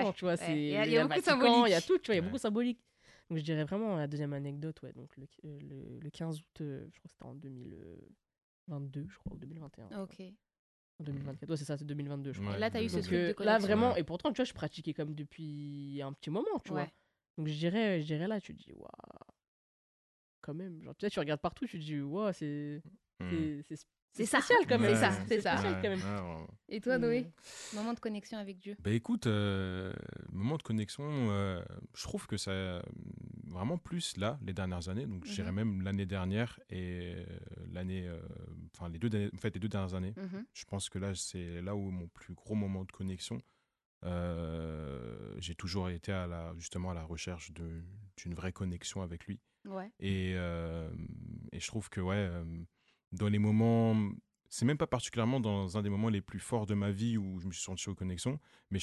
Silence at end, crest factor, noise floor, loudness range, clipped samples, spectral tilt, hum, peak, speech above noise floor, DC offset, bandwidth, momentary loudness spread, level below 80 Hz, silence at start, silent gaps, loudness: 0 s; 22 dB; under -90 dBFS; 12 LU; under 0.1%; -5.5 dB/octave; none; -14 dBFS; over 54 dB; under 0.1%; 12 kHz; 18 LU; -54 dBFS; 0 s; 8.43-8.66 s, 10.59-10.99 s, 17.30-17.34 s, 19.48-20.42 s, 24.02-24.08 s, 43.85-44.01 s; -36 LUFS